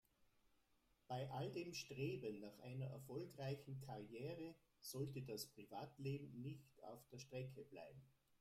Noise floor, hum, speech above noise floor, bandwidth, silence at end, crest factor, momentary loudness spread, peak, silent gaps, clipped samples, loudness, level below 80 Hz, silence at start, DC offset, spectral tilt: -81 dBFS; none; 29 dB; 16 kHz; 0.3 s; 18 dB; 11 LU; -34 dBFS; none; under 0.1%; -52 LUFS; -80 dBFS; 0.2 s; under 0.1%; -5.5 dB/octave